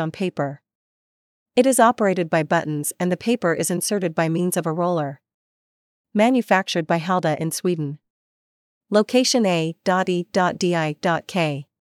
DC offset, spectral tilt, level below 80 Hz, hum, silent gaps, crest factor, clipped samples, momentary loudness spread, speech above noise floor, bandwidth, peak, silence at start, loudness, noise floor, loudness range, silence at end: under 0.1%; -4.5 dB/octave; -74 dBFS; none; 0.75-1.46 s, 5.34-6.04 s, 8.10-8.81 s; 18 dB; under 0.1%; 8 LU; over 70 dB; 15.5 kHz; -2 dBFS; 0 s; -21 LUFS; under -90 dBFS; 2 LU; 0.2 s